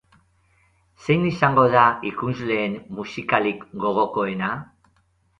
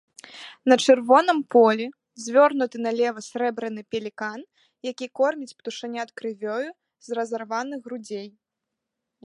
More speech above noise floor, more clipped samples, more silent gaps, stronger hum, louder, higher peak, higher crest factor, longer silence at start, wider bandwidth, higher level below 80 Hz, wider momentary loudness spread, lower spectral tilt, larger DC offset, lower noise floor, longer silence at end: second, 43 dB vs 61 dB; neither; neither; neither; about the same, -21 LUFS vs -23 LUFS; about the same, -2 dBFS vs -4 dBFS; about the same, 20 dB vs 22 dB; first, 1 s vs 0.3 s; second, 9.6 kHz vs 11.5 kHz; first, -56 dBFS vs -80 dBFS; second, 14 LU vs 18 LU; first, -7.5 dB/octave vs -3.5 dB/octave; neither; second, -64 dBFS vs -84 dBFS; second, 0.75 s vs 0.95 s